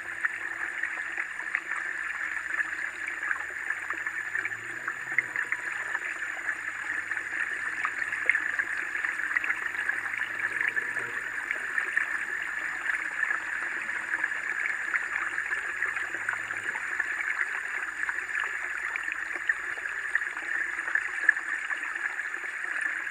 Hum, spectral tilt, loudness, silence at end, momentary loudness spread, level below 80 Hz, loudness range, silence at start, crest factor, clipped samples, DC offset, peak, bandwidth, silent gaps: none; -1 dB/octave; -30 LUFS; 0 s; 4 LU; -70 dBFS; 2 LU; 0 s; 26 dB; under 0.1%; under 0.1%; -6 dBFS; 15 kHz; none